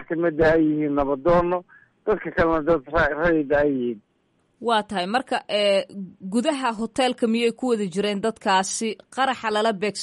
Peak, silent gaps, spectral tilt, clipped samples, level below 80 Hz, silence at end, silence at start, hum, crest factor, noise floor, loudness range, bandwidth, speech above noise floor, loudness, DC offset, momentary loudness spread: -8 dBFS; none; -4.5 dB/octave; under 0.1%; -44 dBFS; 0 s; 0 s; none; 14 dB; -67 dBFS; 2 LU; 11.5 kHz; 45 dB; -22 LUFS; under 0.1%; 7 LU